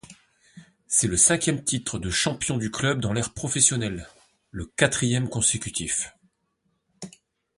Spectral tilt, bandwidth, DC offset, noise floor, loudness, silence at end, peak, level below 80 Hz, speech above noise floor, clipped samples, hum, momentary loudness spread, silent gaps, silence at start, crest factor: -3 dB/octave; 11.5 kHz; under 0.1%; -73 dBFS; -23 LUFS; 0.5 s; -2 dBFS; -48 dBFS; 49 dB; under 0.1%; none; 20 LU; none; 0.1 s; 26 dB